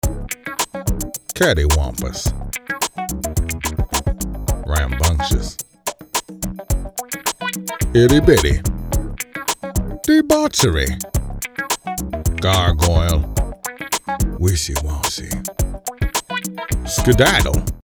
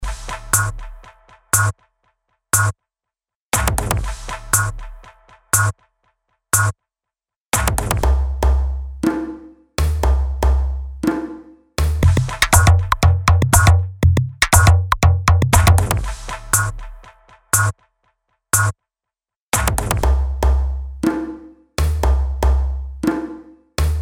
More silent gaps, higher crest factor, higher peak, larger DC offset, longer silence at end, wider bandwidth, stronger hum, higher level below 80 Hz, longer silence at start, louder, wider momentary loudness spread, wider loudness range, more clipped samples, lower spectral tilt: second, none vs 3.36-3.50 s, 7.36-7.50 s, 19.36-19.52 s; about the same, 18 dB vs 18 dB; about the same, 0 dBFS vs 0 dBFS; neither; about the same, 0.05 s vs 0 s; about the same, over 20 kHz vs 19 kHz; neither; about the same, -24 dBFS vs -22 dBFS; about the same, 0.05 s vs 0 s; about the same, -19 LUFS vs -18 LUFS; second, 12 LU vs 15 LU; about the same, 5 LU vs 7 LU; neither; about the same, -4.5 dB/octave vs -4 dB/octave